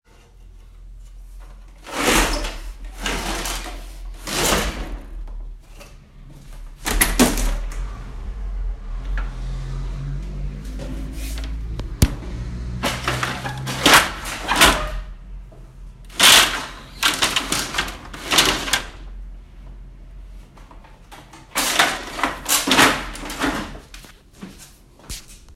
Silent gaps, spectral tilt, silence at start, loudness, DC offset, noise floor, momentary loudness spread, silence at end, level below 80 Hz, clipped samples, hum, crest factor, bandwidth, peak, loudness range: none; -2 dB/octave; 0.35 s; -19 LUFS; under 0.1%; -46 dBFS; 23 LU; 0 s; -30 dBFS; under 0.1%; none; 22 dB; 16.5 kHz; 0 dBFS; 12 LU